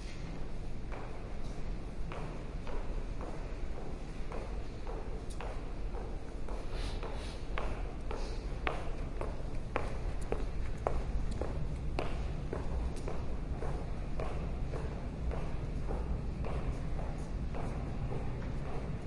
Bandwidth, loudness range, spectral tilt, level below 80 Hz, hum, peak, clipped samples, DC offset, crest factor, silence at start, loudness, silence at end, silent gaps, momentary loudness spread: 11 kHz; 4 LU; -7 dB/octave; -38 dBFS; none; -12 dBFS; under 0.1%; under 0.1%; 24 dB; 0 s; -41 LUFS; 0 s; none; 6 LU